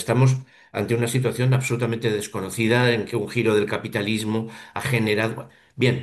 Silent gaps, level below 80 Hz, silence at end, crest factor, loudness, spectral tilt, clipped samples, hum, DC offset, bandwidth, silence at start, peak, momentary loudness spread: none; -54 dBFS; 0 s; 16 dB; -23 LUFS; -6 dB/octave; under 0.1%; none; under 0.1%; 12.5 kHz; 0 s; -6 dBFS; 10 LU